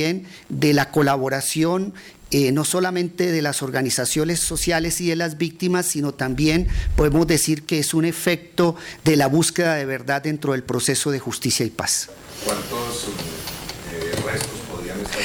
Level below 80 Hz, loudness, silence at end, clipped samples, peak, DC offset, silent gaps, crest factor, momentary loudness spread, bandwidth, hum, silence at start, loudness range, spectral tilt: -36 dBFS; -21 LUFS; 0 s; under 0.1%; -8 dBFS; under 0.1%; none; 14 dB; 10 LU; 19.5 kHz; none; 0 s; 5 LU; -4 dB/octave